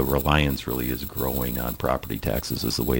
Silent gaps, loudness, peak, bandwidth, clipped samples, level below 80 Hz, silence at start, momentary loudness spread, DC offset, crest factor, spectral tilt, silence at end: none; -25 LUFS; -4 dBFS; 17 kHz; under 0.1%; -34 dBFS; 0 s; 6 LU; under 0.1%; 20 dB; -5 dB/octave; 0 s